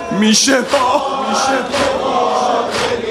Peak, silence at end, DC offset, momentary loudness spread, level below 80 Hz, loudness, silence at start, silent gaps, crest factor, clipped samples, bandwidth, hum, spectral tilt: 0 dBFS; 0 s; under 0.1%; 6 LU; -48 dBFS; -14 LUFS; 0 s; none; 14 dB; under 0.1%; 16 kHz; none; -2.5 dB/octave